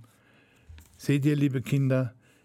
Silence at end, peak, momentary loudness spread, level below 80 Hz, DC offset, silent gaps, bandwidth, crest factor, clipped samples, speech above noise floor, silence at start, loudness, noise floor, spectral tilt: 0.35 s; -12 dBFS; 9 LU; -60 dBFS; under 0.1%; none; 14.5 kHz; 16 dB; under 0.1%; 36 dB; 0.7 s; -27 LUFS; -61 dBFS; -7.5 dB/octave